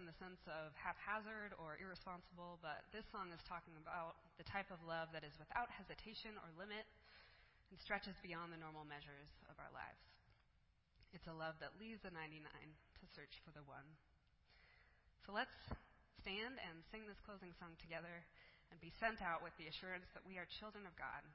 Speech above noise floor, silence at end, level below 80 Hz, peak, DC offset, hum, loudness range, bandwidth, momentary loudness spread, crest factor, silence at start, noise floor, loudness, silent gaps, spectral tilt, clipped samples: 25 dB; 0 s; -72 dBFS; -28 dBFS; under 0.1%; none; 6 LU; 5.6 kHz; 15 LU; 26 dB; 0 s; -78 dBFS; -52 LUFS; none; -2.5 dB/octave; under 0.1%